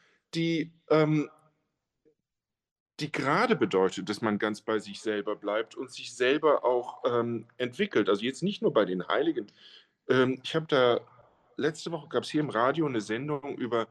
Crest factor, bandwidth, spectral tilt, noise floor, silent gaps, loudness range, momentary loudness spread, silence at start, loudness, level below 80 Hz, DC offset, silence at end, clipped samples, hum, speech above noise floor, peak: 18 dB; 11.5 kHz; -5.5 dB/octave; -89 dBFS; 2.71-2.86 s; 2 LU; 10 LU; 0.35 s; -29 LUFS; -76 dBFS; under 0.1%; 0.05 s; under 0.1%; none; 61 dB; -10 dBFS